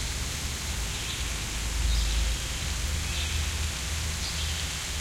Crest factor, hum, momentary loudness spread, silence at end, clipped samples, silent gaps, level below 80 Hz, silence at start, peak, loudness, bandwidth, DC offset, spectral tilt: 14 dB; none; 3 LU; 0 s; under 0.1%; none; -32 dBFS; 0 s; -16 dBFS; -30 LUFS; 16.5 kHz; under 0.1%; -2.5 dB/octave